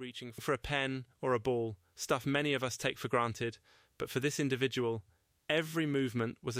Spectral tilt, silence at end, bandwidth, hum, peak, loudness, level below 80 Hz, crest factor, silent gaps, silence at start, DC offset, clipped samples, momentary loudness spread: -4.5 dB/octave; 0 s; 16 kHz; none; -16 dBFS; -35 LUFS; -62 dBFS; 18 dB; none; 0 s; under 0.1%; under 0.1%; 9 LU